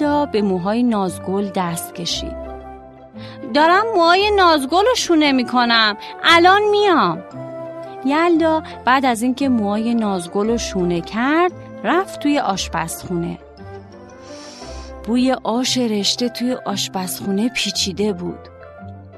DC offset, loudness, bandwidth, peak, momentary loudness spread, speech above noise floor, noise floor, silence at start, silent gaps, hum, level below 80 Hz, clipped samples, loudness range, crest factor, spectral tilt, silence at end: under 0.1%; -17 LUFS; 13.5 kHz; 0 dBFS; 20 LU; 21 dB; -39 dBFS; 0 s; none; none; -44 dBFS; under 0.1%; 8 LU; 18 dB; -4 dB/octave; 0 s